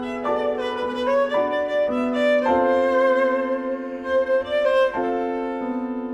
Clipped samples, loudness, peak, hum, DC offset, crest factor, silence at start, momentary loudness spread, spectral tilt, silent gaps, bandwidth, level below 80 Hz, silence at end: under 0.1%; -22 LUFS; -10 dBFS; none; under 0.1%; 12 dB; 0 s; 8 LU; -5 dB/octave; none; 9.6 kHz; -56 dBFS; 0 s